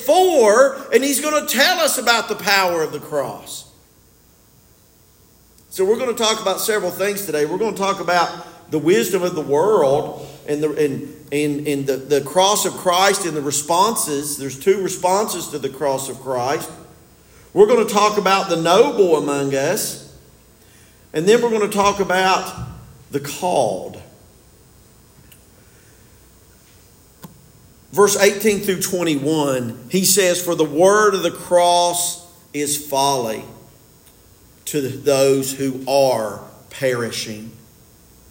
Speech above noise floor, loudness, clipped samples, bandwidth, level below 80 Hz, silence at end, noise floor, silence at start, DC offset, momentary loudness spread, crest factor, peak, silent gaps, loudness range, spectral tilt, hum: 34 dB; -18 LUFS; under 0.1%; 17 kHz; -56 dBFS; 0.75 s; -52 dBFS; 0 s; under 0.1%; 12 LU; 18 dB; 0 dBFS; none; 7 LU; -3 dB/octave; none